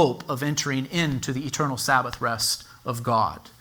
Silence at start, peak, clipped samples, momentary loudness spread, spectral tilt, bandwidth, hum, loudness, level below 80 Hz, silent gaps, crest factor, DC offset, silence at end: 0 s; -6 dBFS; under 0.1%; 6 LU; -4 dB/octave; over 20 kHz; none; -25 LUFS; -52 dBFS; none; 20 dB; under 0.1%; 0.1 s